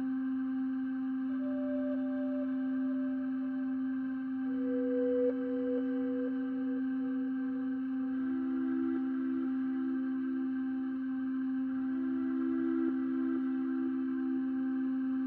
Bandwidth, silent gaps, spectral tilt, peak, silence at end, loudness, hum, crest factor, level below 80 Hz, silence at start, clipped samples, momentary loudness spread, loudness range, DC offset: 3.2 kHz; none; -6.5 dB/octave; -22 dBFS; 0 s; -34 LUFS; none; 12 dB; -74 dBFS; 0 s; under 0.1%; 3 LU; 1 LU; under 0.1%